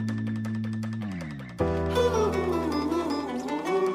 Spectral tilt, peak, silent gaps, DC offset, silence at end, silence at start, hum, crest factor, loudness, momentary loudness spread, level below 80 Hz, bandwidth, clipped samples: -6.5 dB/octave; -12 dBFS; none; under 0.1%; 0 s; 0 s; none; 14 dB; -28 LUFS; 9 LU; -44 dBFS; 15.5 kHz; under 0.1%